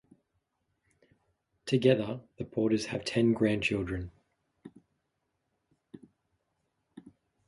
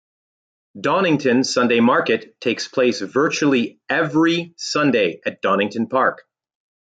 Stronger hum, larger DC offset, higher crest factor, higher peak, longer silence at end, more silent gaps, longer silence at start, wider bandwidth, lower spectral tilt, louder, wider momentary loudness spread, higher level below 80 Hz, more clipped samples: neither; neither; first, 22 dB vs 16 dB; second, -12 dBFS vs -4 dBFS; second, 0.4 s vs 0.8 s; neither; first, 1.65 s vs 0.75 s; first, 11.5 kHz vs 9.2 kHz; first, -6 dB/octave vs -4.5 dB/octave; second, -30 LUFS vs -19 LUFS; first, 14 LU vs 7 LU; first, -58 dBFS vs -66 dBFS; neither